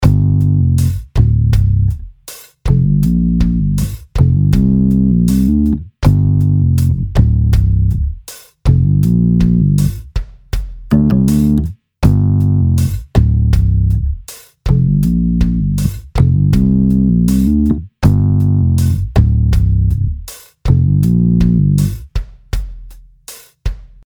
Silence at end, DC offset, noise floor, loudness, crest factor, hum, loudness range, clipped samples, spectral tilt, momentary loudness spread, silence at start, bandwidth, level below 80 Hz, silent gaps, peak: 0.2 s; under 0.1%; -37 dBFS; -13 LUFS; 12 dB; none; 2 LU; under 0.1%; -8.5 dB/octave; 13 LU; 0 s; 19.5 kHz; -20 dBFS; none; 0 dBFS